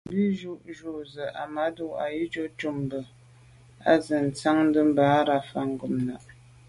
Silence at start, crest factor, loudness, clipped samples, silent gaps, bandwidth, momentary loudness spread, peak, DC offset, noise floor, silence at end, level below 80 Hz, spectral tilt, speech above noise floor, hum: 0.05 s; 20 dB; -26 LUFS; under 0.1%; none; 11.5 kHz; 16 LU; -8 dBFS; under 0.1%; -53 dBFS; 0.45 s; -62 dBFS; -6.5 dB/octave; 27 dB; none